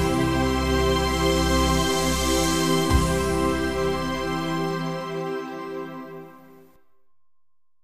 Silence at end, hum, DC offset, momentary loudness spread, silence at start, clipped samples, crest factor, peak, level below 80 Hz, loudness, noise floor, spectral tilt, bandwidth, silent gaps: 0 s; none; under 0.1%; 12 LU; 0 s; under 0.1%; 18 dB; -6 dBFS; -32 dBFS; -23 LUFS; -72 dBFS; -4.5 dB/octave; 15.5 kHz; none